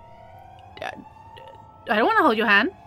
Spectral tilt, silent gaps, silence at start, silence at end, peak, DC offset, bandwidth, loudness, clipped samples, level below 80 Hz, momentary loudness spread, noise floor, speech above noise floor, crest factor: -5 dB/octave; none; 0.75 s; 0.15 s; -4 dBFS; under 0.1%; 17 kHz; -19 LUFS; under 0.1%; -60 dBFS; 18 LU; -45 dBFS; 25 dB; 20 dB